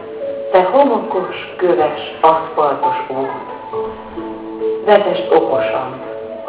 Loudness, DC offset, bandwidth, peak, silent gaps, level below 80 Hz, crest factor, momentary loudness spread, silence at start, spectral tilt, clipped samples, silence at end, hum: -16 LUFS; under 0.1%; 4 kHz; 0 dBFS; none; -54 dBFS; 16 dB; 14 LU; 0 s; -9 dB/octave; under 0.1%; 0 s; none